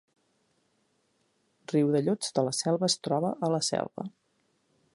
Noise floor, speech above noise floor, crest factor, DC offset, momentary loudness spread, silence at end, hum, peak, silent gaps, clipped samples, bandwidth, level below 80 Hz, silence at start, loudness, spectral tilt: -73 dBFS; 45 dB; 20 dB; under 0.1%; 9 LU; 0.85 s; none; -10 dBFS; none; under 0.1%; 11.5 kHz; -76 dBFS; 1.7 s; -28 LUFS; -4.5 dB/octave